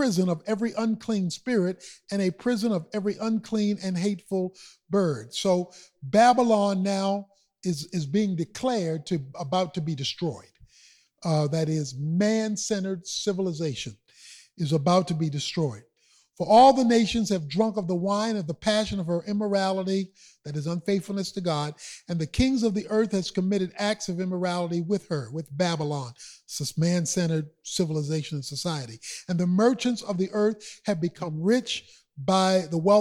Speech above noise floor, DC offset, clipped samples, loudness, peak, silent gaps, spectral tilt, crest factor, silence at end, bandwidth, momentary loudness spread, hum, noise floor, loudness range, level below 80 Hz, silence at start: 38 dB; under 0.1%; under 0.1%; -26 LUFS; -8 dBFS; none; -5.5 dB/octave; 18 dB; 0 s; 14 kHz; 11 LU; none; -63 dBFS; 6 LU; -54 dBFS; 0 s